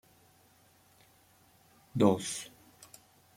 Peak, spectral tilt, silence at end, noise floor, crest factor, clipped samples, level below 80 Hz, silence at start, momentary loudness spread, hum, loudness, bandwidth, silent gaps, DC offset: -10 dBFS; -5.5 dB/octave; 0.9 s; -64 dBFS; 26 dB; under 0.1%; -72 dBFS; 1.95 s; 27 LU; none; -31 LUFS; 16.5 kHz; none; under 0.1%